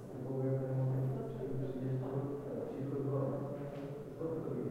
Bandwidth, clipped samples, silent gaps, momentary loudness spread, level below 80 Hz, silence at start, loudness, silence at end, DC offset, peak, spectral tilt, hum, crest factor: 4.7 kHz; under 0.1%; none; 7 LU; -64 dBFS; 0 s; -39 LUFS; 0 s; under 0.1%; -26 dBFS; -10 dB/octave; none; 12 dB